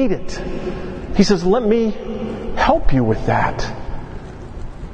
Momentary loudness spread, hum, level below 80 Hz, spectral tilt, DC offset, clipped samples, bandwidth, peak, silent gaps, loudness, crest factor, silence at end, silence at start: 18 LU; none; -26 dBFS; -6.5 dB/octave; under 0.1%; under 0.1%; 8.6 kHz; 0 dBFS; none; -19 LUFS; 18 dB; 0 s; 0 s